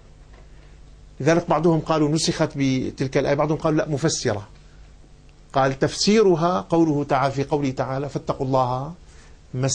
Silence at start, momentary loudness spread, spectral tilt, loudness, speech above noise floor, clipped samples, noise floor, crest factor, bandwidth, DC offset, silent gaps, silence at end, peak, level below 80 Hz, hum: 0.2 s; 8 LU; -5.5 dB/octave; -21 LUFS; 27 dB; under 0.1%; -47 dBFS; 16 dB; 10 kHz; under 0.1%; none; 0 s; -6 dBFS; -46 dBFS; none